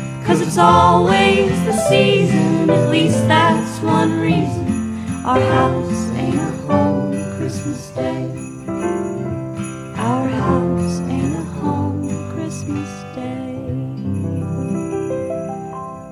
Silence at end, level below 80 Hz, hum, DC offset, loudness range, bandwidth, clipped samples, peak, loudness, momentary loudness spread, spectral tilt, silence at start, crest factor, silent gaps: 0 s; -44 dBFS; none; under 0.1%; 10 LU; 14 kHz; under 0.1%; 0 dBFS; -18 LUFS; 13 LU; -6 dB/octave; 0 s; 16 dB; none